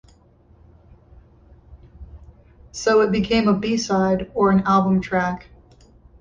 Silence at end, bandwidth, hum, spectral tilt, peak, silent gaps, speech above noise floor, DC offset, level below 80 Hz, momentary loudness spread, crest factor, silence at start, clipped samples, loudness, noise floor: 0.8 s; 7.6 kHz; none; -6 dB/octave; -6 dBFS; none; 34 dB; under 0.1%; -46 dBFS; 8 LU; 16 dB; 1.7 s; under 0.1%; -19 LUFS; -53 dBFS